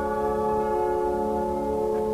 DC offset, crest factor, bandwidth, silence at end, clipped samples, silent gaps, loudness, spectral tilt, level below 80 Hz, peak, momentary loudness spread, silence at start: 0.2%; 10 dB; 13.5 kHz; 0 s; under 0.1%; none; -26 LUFS; -7.5 dB/octave; -44 dBFS; -14 dBFS; 2 LU; 0 s